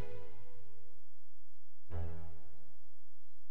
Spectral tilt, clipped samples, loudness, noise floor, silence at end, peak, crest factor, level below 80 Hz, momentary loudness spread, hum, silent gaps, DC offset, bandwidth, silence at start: -7.5 dB/octave; under 0.1%; -49 LUFS; -72 dBFS; 0.25 s; -26 dBFS; 18 dB; -58 dBFS; 21 LU; none; none; 4%; 13 kHz; 0 s